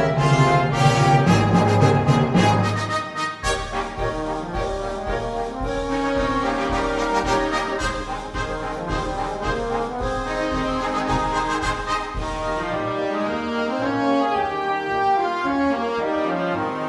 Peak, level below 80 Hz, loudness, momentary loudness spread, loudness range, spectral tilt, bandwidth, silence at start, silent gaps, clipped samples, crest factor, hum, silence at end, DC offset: -4 dBFS; -36 dBFS; -22 LUFS; 9 LU; 7 LU; -6 dB/octave; 11.5 kHz; 0 s; none; under 0.1%; 16 dB; none; 0 s; under 0.1%